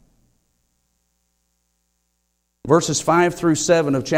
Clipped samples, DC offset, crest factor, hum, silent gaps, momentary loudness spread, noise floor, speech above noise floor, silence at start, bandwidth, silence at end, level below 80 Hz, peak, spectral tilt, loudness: under 0.1%; under 0.1%; 18 dB; 60 Hz at -55 dBFS; none; 3 LU; -71 dBFS; 54 dB; 2.65 s; 16 kHz; 0 s; -54 dBFS; -2 dBFS; -4.5 dB/octave; -18 LUFS